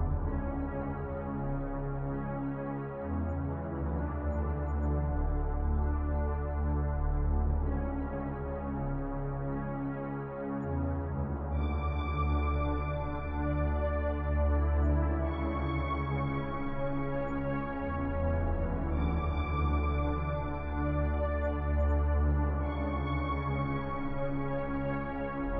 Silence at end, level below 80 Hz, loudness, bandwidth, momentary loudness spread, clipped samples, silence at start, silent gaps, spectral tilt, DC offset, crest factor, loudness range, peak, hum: 0 s; -36 dBFS; -33 LUFS; 3.8 kHz; 6 LU; under 0.1%; 0 s; none; -11 dB/octave; under 0.1%; 14 dB; 4 LU; -18 dBFS; none